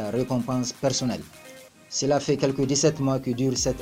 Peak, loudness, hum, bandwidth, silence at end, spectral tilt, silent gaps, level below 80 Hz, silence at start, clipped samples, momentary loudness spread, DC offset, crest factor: -8 dBFS; -25 LUFS; none; 16 kHz; 0 s; -4.5 dB/octave; none; -50 dBFS; 0 s; under 0.1%; 9 LU; under 0.1%; 18 dB